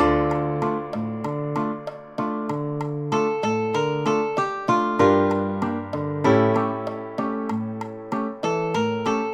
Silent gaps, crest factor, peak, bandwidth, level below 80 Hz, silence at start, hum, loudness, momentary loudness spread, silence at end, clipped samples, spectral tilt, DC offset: none; 18 dB; -4 dBFS; 9.6 kHz; -48 dBFS; 0 s; none; -24 LUFS; 10 LU; 0 s; under 0.1%; -7 dB/octave; under 0.1%